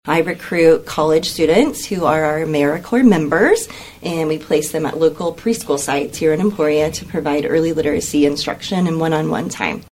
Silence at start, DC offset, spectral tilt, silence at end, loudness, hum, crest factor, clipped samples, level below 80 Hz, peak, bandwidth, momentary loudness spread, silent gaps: 0.05 s; under 0.1%; -5 dB/octave; 0.1 s; -17 LUFS; none; 16 dB; under 0.1%; -46 dBFS; 0 dBFS; 16.5 kHz; 8 LU; none